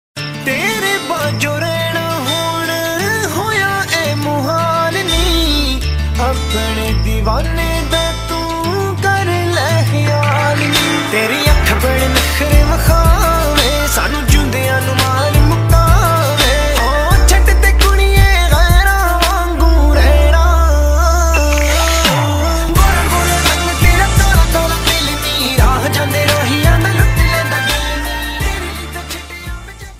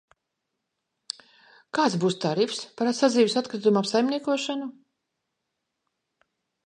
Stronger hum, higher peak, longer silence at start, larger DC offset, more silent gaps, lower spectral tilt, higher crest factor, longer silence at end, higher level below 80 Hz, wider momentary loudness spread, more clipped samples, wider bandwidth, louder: neither; first, 0 dBFS vs -8 dBFS; second, 0.15 s vs 1.75 s; neither; neither; about the same, -4 dB/octave vs -5 dB/octave; second, 12 dB vs 20 dB; second, 0 s vs 1.95 s; first, -16 dBFS vs -78 dBFS; second, 6 LU vs 16 LU; first, 0.1% vs under 0.1%; first, 16.5 kHz vs 11 kHz; first, -13 LUFS vs -25 LUFS